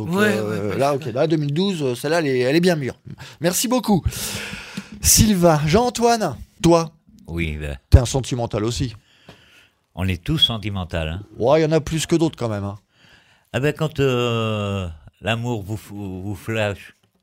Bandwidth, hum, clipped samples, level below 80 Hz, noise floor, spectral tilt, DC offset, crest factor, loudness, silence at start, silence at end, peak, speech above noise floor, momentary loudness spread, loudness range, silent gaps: 16 kHz; none; under 0.1%; -34 dBFS; -54 dBFS; -4.5 dB/octave; under 0.1%; 20 dB; -20 LUFS; 0 s; 0.3 s; 0 dBFS; 35 dB; 14 LU; 6 LU; none